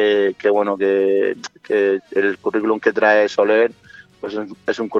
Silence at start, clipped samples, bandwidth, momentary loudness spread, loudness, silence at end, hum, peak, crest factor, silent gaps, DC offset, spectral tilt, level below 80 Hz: 0 s; under 0.1%; 7.6 kHz; 12 LU; -18 LUFS; 0 s; none; -2 dBFS; 16 dB; none; under 0.1%; -5 dB/octave; -66 dBFS